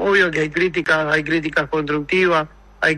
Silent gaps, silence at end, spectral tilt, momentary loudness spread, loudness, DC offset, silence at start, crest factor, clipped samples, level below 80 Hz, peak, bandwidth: none; 0 s; -5.5 dB/octave; 5 LU; -18 LUFS; under 0.1%; 0 s; 16 dB; under 0.1%; -46 dBFS; -2 dBFS; 11.5 kHz